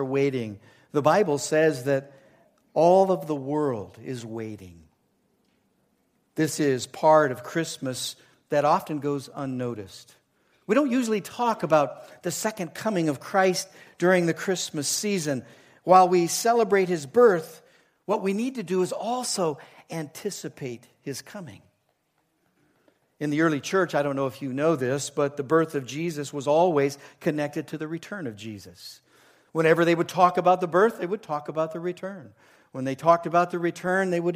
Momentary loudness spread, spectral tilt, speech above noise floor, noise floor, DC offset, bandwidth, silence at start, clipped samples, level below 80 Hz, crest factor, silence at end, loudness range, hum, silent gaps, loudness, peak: 16 LU; -5 dB/octave; 47 dB; -72 dBFS; under 0.1%; 15.5 kHz; 0 s; under 0.1%; -72 dBFS; 22 dB; 0 s; 8 LU; none; none; -25 LUFS; -4 dBFS